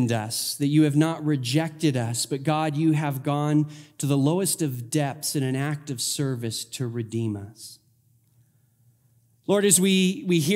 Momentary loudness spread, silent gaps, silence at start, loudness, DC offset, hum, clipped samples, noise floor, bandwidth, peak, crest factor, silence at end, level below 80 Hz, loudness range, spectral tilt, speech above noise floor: 11 LU; none; 0 s; -24 LUFS; under 0.1%; none; under 0.1%; -63 dBFS; 16 kHz; -4 dBFS; 20 dB; 0 s; -72 dBFS; 7 LU; -5 dB/octave; 39 dB